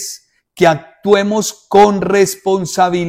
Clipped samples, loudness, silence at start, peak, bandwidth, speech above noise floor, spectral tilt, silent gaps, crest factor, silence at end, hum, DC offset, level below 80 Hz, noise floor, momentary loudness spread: under 0.1%; -13 LUFS; 0 s; 0 dBFS; 16 kHz; 24 dB; -4.5 dB/octave; none; 14 dB; 0 s; none; under 0.1%; -50 dBFS; -36 dBFS; 9 LU